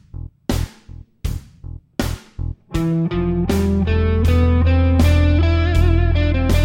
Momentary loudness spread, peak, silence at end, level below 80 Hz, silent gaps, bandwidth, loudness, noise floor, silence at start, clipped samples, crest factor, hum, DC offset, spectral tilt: 15 LU; -4 dBFS; 0 s; -22 dBFS; none; 16.5 kHz; -18 LUFS; -39 dBFS; 0.15 s; under 0.1%; 12 dB; none; under 0.1%; -7 dB/octave